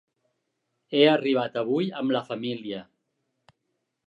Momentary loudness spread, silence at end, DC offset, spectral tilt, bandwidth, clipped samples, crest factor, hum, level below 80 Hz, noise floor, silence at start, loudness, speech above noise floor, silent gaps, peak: 14 LU; 1.25 s; under 0.1%; -7 dB/octave; 7.4 kHz; under 0.1%; 22 dB; none; -78 dBFS; -79 dBFS; 0.9 s; -25 LUFS; 54 dB; none; -6 dBFS